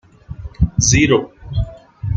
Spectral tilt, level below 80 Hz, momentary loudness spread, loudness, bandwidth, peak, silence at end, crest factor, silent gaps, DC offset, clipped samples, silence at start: -4.5 dB/octave; -28 dBFS; 21 LU; -16 LUFS; 10 kHz; -2 dBFS; 0 s; 16 dB; none; under 0.1%; under 0.1%; 0.3 s